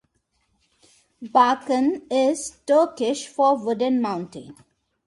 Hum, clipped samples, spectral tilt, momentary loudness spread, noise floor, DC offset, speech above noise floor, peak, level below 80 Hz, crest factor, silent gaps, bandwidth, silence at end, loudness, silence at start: none; under 0.1%; -4 dB/octave; 12 LU; -70 dBFS; under 0.1%; 48 dB; -4 dBFS; -68 dBFS; 20 dB; none; 11.5 kHz; 0.55 s; -22 LUFS; 1.2 s